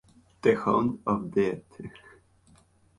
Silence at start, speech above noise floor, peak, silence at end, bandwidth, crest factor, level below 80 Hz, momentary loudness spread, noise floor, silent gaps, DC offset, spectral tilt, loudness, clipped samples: 0.45 s; 34 dB; -10 dBFS; 1.1 s; 11.5 kHz; 20 dB; -60 dBFS; 20 LU; -60 dBFS; none; under 0.1%; -7.5 dB/octave; -27 LUFS; under 0.1%